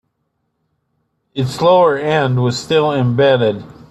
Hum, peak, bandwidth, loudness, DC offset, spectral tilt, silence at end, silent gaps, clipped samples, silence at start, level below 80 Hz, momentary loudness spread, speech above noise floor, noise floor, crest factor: none; -2 dBFS; 12 kHz; -14 LUFS; under 0.1%; -6 dB/octave; 0.1 s; none; under 0.1%; 1.35 s; -54 dBFS; 11 LU; 56 dB; -69 dBFS; 14 dB